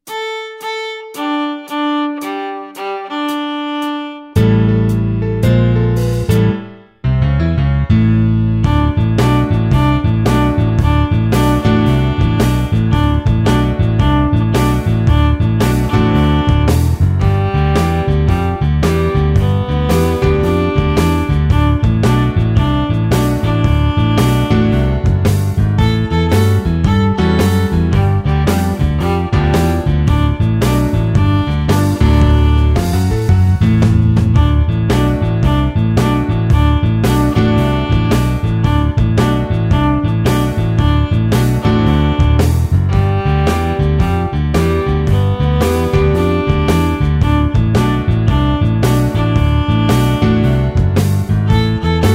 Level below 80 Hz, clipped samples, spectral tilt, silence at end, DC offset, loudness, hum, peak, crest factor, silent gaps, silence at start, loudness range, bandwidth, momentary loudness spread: -20 dBFS; under 0.1%; -7.5 dB/octave; 0 s; under 0.1%; -14 LUFS; none; 0 dBFS; 12 dB; none; 0.05 s; 1 LU; 16 kHz; 4 LU